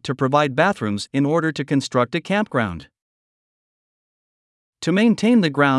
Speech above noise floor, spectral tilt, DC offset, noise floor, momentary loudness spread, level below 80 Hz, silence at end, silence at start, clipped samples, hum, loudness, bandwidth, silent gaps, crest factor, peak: over 71 dB; -6 dB/octave; under 0.1%; under -90 dBFS; 7 LU; -60 dBFS; 0 s; 0.05 s; under 0.1%; none; -20 LUFS; 12 kHz; 3.02-4.73 s; 18 dB; -2 dBFS